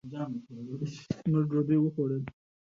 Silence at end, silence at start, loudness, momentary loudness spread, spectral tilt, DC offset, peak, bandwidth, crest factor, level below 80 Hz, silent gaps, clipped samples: 0.4 s; 0.05 s; -31 LUFS; 13 LU; -9 dB/octave; under 0.1%; -16 dBFS; 7.2 kHz; 14 dB; -64 dBFS; none; under 0.1%